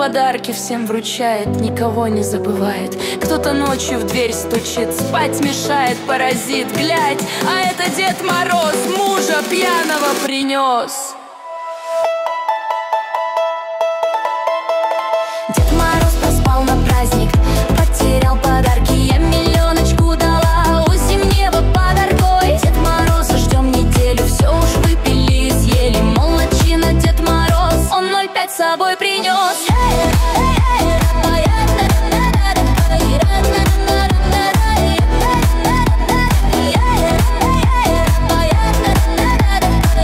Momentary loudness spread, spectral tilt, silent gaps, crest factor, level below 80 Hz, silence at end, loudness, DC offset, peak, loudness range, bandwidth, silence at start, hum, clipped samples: 5 LU; -5 dB/octave; none; 10 dB; -18 dBFS; 0 s; -15 LUFS; under 0.1%; -2 dBFS; 4 LU; 16.5 kHz; 0 s; none; under 0.1%